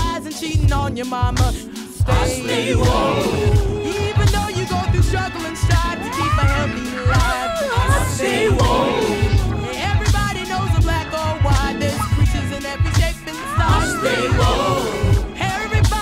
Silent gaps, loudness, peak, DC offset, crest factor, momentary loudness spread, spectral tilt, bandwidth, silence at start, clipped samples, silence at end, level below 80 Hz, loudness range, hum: none; -19 LUFS; -6 dBFS; under 0.1%; 12 dB; 6 LU; -5.5 dB/octave; 16 kHz; 0 s; under 0.1%; 0 s; -24 dBFS; 1 LU; none